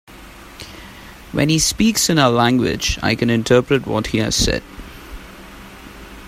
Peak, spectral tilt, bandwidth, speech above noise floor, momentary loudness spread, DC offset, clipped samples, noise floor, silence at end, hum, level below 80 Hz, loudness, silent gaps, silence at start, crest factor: 0 dBFS; -4 dB/octave; 16 kHz; 23 dB; 23 LU; under 0.1%; under 0.1%; -39 dBFS; 0 s; none; -36 dBFS; -16 LUFS; none; 0.1 s; 18 dB